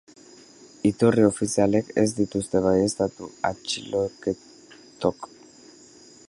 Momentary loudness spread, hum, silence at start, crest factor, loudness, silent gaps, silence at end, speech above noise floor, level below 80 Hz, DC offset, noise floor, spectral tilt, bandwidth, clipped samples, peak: 10 LU; none; 0.85 s; 20 dB; -24 LUFS; none; 1.05 s; 27 dB; -54 dBFS; under 0.1%; -50 dBFS; -5.5 dB/octave; 11.5 kHz; under 0.1%; -6 dBFS